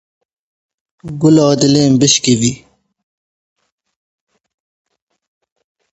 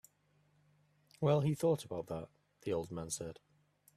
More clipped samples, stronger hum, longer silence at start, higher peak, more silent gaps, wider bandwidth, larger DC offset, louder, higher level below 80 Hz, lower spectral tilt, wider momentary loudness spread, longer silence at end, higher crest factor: neither; second, none vs 50 Hz at -60 dBFS; second, 1.05 s vs 1.2 s; first, 0 dBFS vs -18 dBFS; neither; second, 8.2 kHz vs 14 kHz; neither; first, -11 LUFS vs -37 LUFS; first, -50 dBFS vs -70 dBFS; second, -4.5 dB/octave vs -6.5 dB/octave; second, 12 LU vs 15 LU; first, 3.35 s vs 0.65 s; about the same, 16 dB vs 20 dB